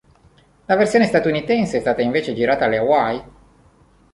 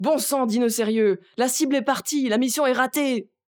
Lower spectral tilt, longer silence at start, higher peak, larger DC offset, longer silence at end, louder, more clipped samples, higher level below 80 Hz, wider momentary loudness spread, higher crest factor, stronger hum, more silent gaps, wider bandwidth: first, -6 dB/octave vs -3.5 dB/octave; first, 0.7 s vs 0 s; first, -2 dBFS vs -6 dBFS; neither; first, 0.85 s vs 0.3 s; first, -18 LUFS vs -22 LUFS; neither; first, -50 dBFS vs -78 dBFS; about the same, 5 LU vs 3 LU; about the same, 18 dB vs 16 dB; neither; neither; second, 11.5 kHz vs over 20 kHz